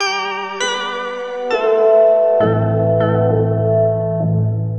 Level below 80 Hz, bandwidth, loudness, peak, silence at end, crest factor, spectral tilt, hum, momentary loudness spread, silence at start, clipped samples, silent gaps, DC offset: -46 dBFS; 8.6 kHz; -16 LUFS; -2 dBFS; 0 s; 14 dB; -6 dB/octave; none; 10 LU; 0 s; under 0.1%; none; under 0.1%